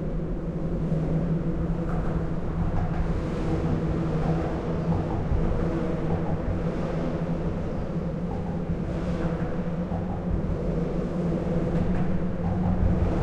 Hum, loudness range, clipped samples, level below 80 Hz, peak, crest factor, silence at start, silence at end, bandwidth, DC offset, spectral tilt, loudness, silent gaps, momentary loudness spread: none; 2 LU; under 0.1%; -32 dBFS; -12 dBFS; 14 dB; 0 s; 0 s; 7.8 kHz; under 0.1%; -9.5 dB/octave; -28 LUFS; none; 4 LU